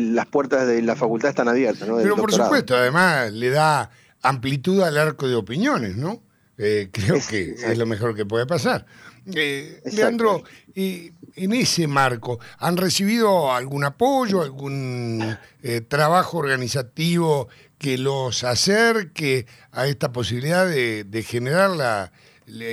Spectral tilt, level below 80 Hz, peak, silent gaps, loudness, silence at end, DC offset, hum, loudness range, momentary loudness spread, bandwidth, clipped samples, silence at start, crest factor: -5 dB/octave; -60 dBFS; -4 dBFS; none; -21 LUFS; 0 s; under 0.1%; none; 4 LU; 10 LU; 15.5 kHz; under 0.1%; 0 s; 16 dB